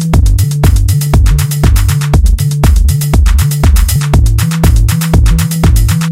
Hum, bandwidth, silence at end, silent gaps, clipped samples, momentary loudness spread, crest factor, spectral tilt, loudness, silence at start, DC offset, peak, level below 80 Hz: none; 16.5 kHz; 0 s; none; 0.1%; 1 LU; 8 dB; -5.5 dB/octave; -10 LUFS; 0 s; 0.5%; 0 dBFS; -10 dBFS